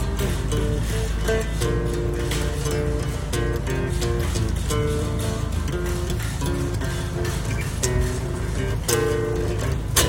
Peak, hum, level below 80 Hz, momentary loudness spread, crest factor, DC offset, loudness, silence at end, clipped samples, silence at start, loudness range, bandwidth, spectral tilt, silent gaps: -4 dBFS; none; -28 dBFS; 3 LU; 20 dB; under 0.1%; -25 LUFS; 0 s; under 0.1%; 0 s; 1 LU; 16.5 kHz; -5 dB/octave; none